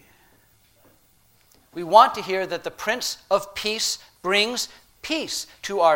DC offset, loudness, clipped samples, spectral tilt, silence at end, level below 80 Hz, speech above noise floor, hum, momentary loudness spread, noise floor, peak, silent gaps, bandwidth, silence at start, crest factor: under 0.1%; -22 LUFS; under 0.1%; -1.5 dB/octave; 0 s; -62 dBFS; 37 dB; none; 14 LU; -59 dBFS; 0 dBFS; none; 16.5 kHz; 1.75 s; 24 dB